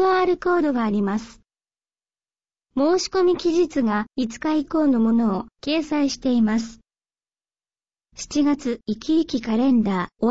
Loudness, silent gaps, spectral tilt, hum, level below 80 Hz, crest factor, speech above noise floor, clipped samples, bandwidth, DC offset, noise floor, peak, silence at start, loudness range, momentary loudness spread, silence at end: -22 LUFS; none; -5.5 dB/octave; none; -54 dBFS; 12 dB; over 69 dB; under 0.1%; 8 kHz; 0.3%; under -90 dBFS; -10 dBFS; 0 s; 4 LU; 8 LU; 0 s